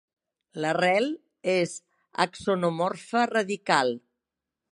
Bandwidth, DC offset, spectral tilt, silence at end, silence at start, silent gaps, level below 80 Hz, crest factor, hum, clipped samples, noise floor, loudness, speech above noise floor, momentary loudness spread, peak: 11.5 kHz; under 0.1%; -4.5 dB/octave; 0.75 s; 0.55 s; none; -70 dBFS; 22 dB; none; under 0.1%; -87 dBFS; -26 LUFS; 61 dB; 11 LU; -4 dBFS